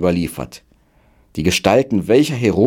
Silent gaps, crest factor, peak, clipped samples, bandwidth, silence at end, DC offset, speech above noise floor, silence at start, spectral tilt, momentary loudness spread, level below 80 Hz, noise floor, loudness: none; 16 dB; 0 dBFS; under 0.1%; 17.5 kHz; 0 s; under 0.1%; 38 dB; 0 s; -5.5 dB/octave; 16 LU; -42 dBFS; -54 dBFS; -16 LUFS